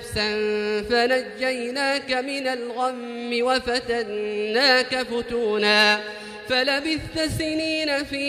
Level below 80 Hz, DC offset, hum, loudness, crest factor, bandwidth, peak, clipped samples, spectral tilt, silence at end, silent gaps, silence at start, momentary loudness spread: -50 dBFS; under 0.1%; none; -22 LUFS; 18 dB; 15 kHz; -6 dBFS; under 0.1%; -3.5 dB/octave; 0 s; none; 0 s; 9 LU